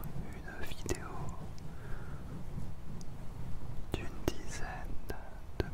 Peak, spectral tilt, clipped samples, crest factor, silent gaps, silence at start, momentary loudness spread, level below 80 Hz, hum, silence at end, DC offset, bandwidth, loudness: -12 dBFS; -5.5 dB/octave; under 0.1%; 22 dB; none; 0 s; 8 LU; -44 dBFS; none; 0 s; under 0.1%; 16 kHz; -44 LUFS